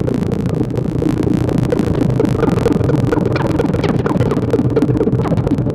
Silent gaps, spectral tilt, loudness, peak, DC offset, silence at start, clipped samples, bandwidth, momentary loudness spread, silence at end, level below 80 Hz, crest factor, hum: none; -8.5 dB/octave; -16 LUFS; -2 dBFS; under 0.1%; 0 s; under 0.1%; 13.5 kHz; 3 LU; 0 s; -32 dBFS; 12 dB; none